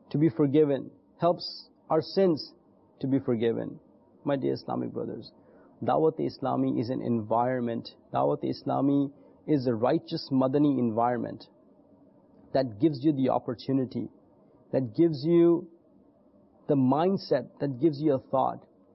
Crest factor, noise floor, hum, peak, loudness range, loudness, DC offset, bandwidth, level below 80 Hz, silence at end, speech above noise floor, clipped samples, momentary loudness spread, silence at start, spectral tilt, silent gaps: 16 dB; -60 dBFS; none; -12 dBFS; 4 LU; -28 LUFS; under 0.1%; 5.8 kHz; -68 dBFS; 0.35 s; 33 dB; under 0.1%; 13 LU; 0.15 s; -10.5 dB/octave; none